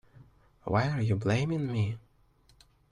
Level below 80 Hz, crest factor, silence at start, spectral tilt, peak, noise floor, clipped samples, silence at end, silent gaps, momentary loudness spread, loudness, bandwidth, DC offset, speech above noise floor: -58 dBFS; 18 dB; 0.2 s; -7.5 dB/octave; -14 dBFS; -64 dBFS; under 0.1%; 0.9 s; none; 10 LU; -30 LUFS; 10.5 kHz; under 0.1%; 35 dB